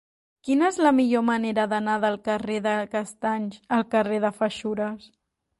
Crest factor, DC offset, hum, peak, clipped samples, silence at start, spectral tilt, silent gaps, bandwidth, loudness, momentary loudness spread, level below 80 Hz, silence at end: 16 dB; under 0.1%; none; -8 dBFS; under 0.1%; 0.45 s; -5.5 dB/octave; none; 11.5 kHz; -24 LUFS; 10 LU; -66 dBFS; 0.6 s